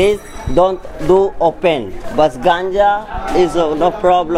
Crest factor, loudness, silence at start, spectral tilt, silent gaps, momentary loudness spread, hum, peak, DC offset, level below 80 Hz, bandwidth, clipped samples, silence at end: 12 dB; -15 LUFS; 0 s; -6 dB/octave; none; 7 LU; none; 0 dBFS; under 0.1%; -30 dBFS; 14 kHz; under 0.1%; 0 s